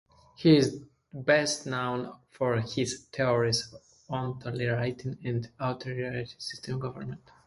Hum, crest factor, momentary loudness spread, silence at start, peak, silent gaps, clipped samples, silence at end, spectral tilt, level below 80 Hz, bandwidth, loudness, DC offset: none; 22 dB; 14 LU; 0.4 s; -8 dBFS; none; under 0.1%; 0.3 s; -5 dB/octave; -62 dBFS; 11.5 kHz; -29 LUFS; under 0.1%